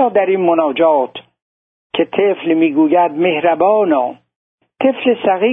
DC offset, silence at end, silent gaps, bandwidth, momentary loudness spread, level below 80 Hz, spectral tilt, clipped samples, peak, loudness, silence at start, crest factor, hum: under 0.1%; 0 s; 1.42-1.90 s, 4.36-4.58 s; 3.9 kHz; 7 LU; -64 dBFS; -9.5 dB/octave; under 0.1%; -2 dBFS; -14 LUFS; 0 s; 14 dB; none